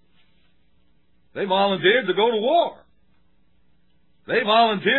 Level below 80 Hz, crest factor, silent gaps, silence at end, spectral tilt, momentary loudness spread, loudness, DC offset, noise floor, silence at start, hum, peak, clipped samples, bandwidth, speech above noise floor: -70 dBFS; 18 dB; none; 0 s; -7.5 dB/octave; 10 LU; -20 LUFS; 0.2%; -65 dBFS; 1.35 s; none; -6 dBFS; under 0.1%; 4.3 kHz; 46 dB